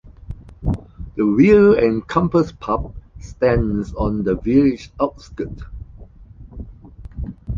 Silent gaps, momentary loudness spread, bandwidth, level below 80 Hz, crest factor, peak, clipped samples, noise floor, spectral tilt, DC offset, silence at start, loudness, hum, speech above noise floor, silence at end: none; 25 LU; 7.4 kHz; -34 dBFS; 18 dB; -2 dBFS; under 0.1%; -41 dBFS; -8.5 dB/octave; under 0.1%; 0.05 s; -18 LUFS; none; 24 dB; 0 s